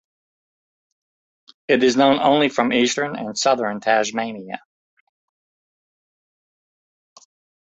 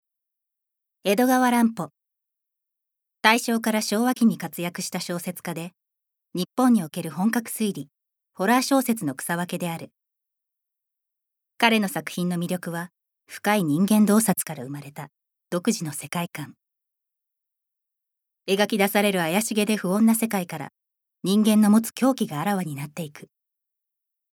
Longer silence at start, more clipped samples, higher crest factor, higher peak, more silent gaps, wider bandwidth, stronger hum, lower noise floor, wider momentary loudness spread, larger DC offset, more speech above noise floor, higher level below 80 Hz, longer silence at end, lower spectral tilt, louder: first, 1.7 s vs 1.05 s; neither; about the same, 20 dB vs 24 dB; about the same, -2 dBFS vs 0 dBFS; neither; second, 8.2 kHz vs 19 kHz; neither; first, under -90 dBFS vs -84 dBFS; about the same, 16 LU vs 17 LU; neither; first, over 71 dB vs 61 dB; first, -66 dBFS vs -78 dBFS; first, 3.15 s vs 1.15 s; about the same, -3.5 dB/octave vs -4.5 dB/octave; first, -19 LUFS vs -23 LUFS